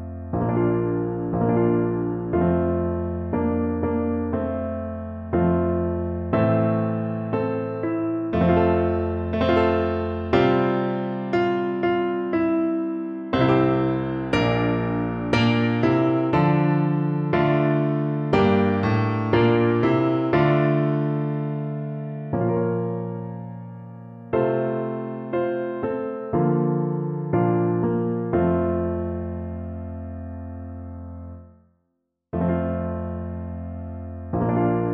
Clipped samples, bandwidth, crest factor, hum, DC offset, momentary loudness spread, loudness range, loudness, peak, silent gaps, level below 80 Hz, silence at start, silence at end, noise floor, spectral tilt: under 0.1%; 6.6 kHz; 16 dB; none; under 0.1%; 13 LU; 8 LU; -23 LUFS; -6 dBFS; none; -44 dBFS; 0 s; 0 s; -75 dBFS; -9 dB/octave